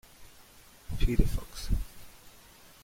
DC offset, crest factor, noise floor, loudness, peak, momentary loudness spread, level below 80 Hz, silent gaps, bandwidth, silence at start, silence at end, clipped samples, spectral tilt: under 0.1%; 20 dB; -55 dBFS; -34 LUFS; -10 dBFS; 24 LU; -34 dBFS; none; 16.5 kHz; 0.2 s; 0.55 s; under 0.1%; -6 dB/octave